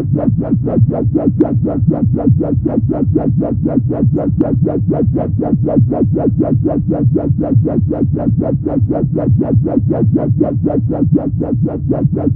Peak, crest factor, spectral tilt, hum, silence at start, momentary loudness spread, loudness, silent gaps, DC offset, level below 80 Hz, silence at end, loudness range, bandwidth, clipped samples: 0 dBFS; 12 dB; -15 dB/octave; none; 0 s; 2 LU; -14 LUFS; none; under 0.1%; -32 dBFS; 0 s; 0 LU; 2.5 kHz; under 0.1%